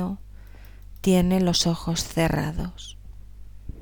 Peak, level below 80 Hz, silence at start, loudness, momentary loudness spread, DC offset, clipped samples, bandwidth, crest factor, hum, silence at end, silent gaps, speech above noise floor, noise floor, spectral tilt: -8 dBFS; -38 dBFS; 0 s; -24 LUFS; 21 LU; 0.3%; under 0.1%; over 20 kHz; 18 dB; 50 Hz at -45 dBFS; 0 s; none; 21 dB; -44 dBFS; -5 dB/octave